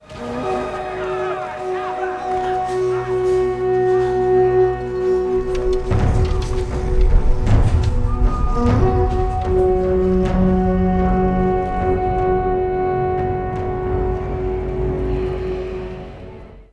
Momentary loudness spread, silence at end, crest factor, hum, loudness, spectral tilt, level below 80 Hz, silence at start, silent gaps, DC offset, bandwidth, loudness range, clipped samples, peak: 8 LU; 0.1 s; 14 dB; none; -19 LUFS; -8.5 dB/octave; -22 dBFS; 0.1 s; none; under 0.1%; 10 kHz; 4 LU; under 0.1%; -4 dBFS